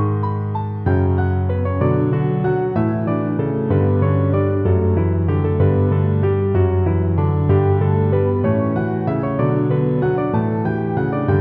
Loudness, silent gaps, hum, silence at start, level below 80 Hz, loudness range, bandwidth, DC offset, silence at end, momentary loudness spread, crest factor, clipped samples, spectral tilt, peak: -18 LUFS; none; none; 0 s; -46 dBFS; 2 LU; 3.8 kHz; under 0.1%; 0 s; 4 LU; 12 dB; under 0.1%; -12.5 dB/octave; -4 dBFS